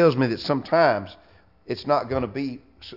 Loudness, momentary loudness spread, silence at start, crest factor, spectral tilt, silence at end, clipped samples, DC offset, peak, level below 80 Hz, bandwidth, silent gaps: -24 LUFS; 14 LU; 0 s; 18 dB; -7.5 dB/octave; 0 s; under 0.1%; under 0.1%; -4 dBFS; -56 dBFS; 5.8 kHz; none